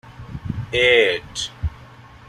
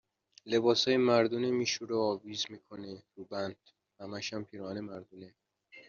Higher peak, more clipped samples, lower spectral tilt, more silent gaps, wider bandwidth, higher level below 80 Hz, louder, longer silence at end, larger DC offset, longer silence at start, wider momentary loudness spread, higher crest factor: first, -2 dBFS vs -14 dBFS; neither; about the same, -3.5 dB/octave vs -3.5 dB/octave; neither; first, 13 kHz vs 7.2 kHz; first, -38 dBFS vs -78 dBFS; first, -18 LUFS vs -32 LUFS; about the same, 0.1 s vs 0.05 s; neither; second, 0.05 s vs 0.45 s; about the same, 18 LU vs 20 LU; about the same, 20 dB vs 20 dB